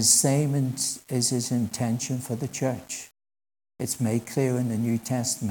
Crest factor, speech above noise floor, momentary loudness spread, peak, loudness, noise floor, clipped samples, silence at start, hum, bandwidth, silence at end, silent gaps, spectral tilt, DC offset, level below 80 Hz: 20 dB; over 64 dB; 9 LU; -6 dBFS; -26 LUFS; under -90 dBFS; under 0.1%; 0 s; none; 18 kHz; 0 s; none; -4 dB/octave; under 0.1%; -66 dBFS